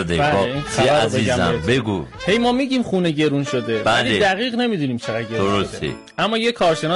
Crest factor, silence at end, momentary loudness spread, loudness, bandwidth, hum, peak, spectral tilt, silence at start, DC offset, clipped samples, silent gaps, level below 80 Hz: 12 dB; 0 s; 7 LU; -19 LUFS; 11.5 kHz; none; -8 dBFS; -5 dB/octave; 0 s; under 0.1%; under 0.1%; none; -44 dBFS